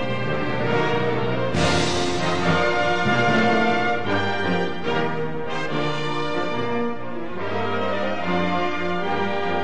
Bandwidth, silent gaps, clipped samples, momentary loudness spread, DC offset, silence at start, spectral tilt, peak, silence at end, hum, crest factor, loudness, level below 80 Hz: 10.5 kHz; none; under 0.1%; 7 LU; 4%; 0 s; -5.5 dB/octave; -8 dBFS; 0 s; none; 14 dB; -23 LUFS; -48 dBFS